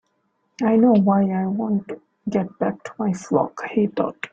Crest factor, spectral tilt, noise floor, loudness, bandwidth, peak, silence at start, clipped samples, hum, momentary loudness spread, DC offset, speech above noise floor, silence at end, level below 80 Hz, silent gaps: 16 dB; -8 dB/octave; -69 dBFS; -21 LUFS; 7.8 kHz; -4 dBFS; 0.6 s; under 0.1%; none; 11 LU; under 0.1%; 49 dB; 0.05 s; -62 dBFS; none